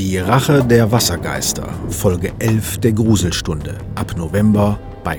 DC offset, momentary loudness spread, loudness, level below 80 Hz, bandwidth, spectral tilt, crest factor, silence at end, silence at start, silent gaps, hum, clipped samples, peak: under 0.1%; 11 LU; -16 LUFS; -32 dBFS; 20 kHz; -5.5 dB/octave; 16 dB; 0 s; 0 s; none; none; under 0.1%; 0 dBFS